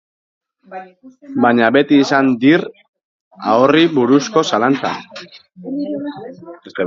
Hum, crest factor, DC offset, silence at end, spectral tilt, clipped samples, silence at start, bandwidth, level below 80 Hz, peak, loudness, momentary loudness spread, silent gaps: none; 16 dB; under 0.1%; 0 s; -5.5 dB/octave; under 0.1%; 0.7 s; 7.6 kHz; -62 dBFS; 0 dBFS; -14 LUFS; 22 LU; 2.88-2.93 s, 3.04-3.31 s